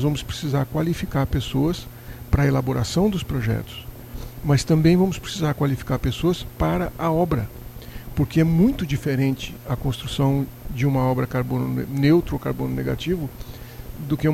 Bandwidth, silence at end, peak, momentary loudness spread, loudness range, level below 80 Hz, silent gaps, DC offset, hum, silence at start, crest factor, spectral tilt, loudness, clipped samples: 16 kHz; 0 s; -4 dBFS; 17 LU; 2 LU; -36 dBFS; none; under 0.1%; none; 0 s; 18 dB; -7 dB/octave; -22 LUFS; under 0.1%